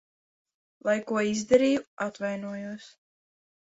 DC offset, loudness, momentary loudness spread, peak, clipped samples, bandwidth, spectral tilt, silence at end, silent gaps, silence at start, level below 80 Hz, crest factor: under 0.1%; -27 LUFS; 15 LU; -8 dBFS; under 0.1%; 8 kHz; -4.5 dB/octave; 0.75 s; 1.87-1.97 s; 0.85 s; -66 dBFS; 20 dB